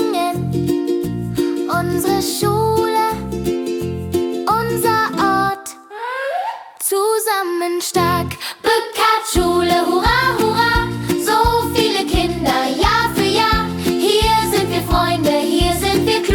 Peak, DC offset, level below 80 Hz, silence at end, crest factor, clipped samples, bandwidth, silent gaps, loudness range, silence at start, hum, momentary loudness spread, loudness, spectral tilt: -2 dBFS; under 0.1%; -32 dBFS; 0 s; 14 dB; under 0.1%; 18 kHz; none; 3 LU; 0 s; none; 7 LU; -17 LUFS; -4.5 dB/octave